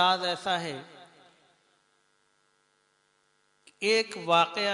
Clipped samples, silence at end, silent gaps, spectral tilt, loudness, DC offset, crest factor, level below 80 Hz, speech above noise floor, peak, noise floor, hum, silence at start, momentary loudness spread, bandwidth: under 0.1%; 0 s; none; -3 dB/octave; -27 LUFS; under 0.1%; 22 dB; -80 dBFS; 43 dB; -10 dBFS; -70 dBFS; none; 0 s; 15 LU; 11 kHz